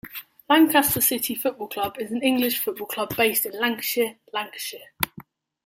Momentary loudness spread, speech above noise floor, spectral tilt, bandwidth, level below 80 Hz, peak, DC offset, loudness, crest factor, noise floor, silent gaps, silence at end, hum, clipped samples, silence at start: 13 LU; 24 dB; -2.5 dB/octave; 16.5 kHz; -60 dBFS; -2 dBFS; under 0.1%; -23 LUFS; 22 dB; -47 dBFS; none; 0.45 s; none; under 0.1%; 0.05 s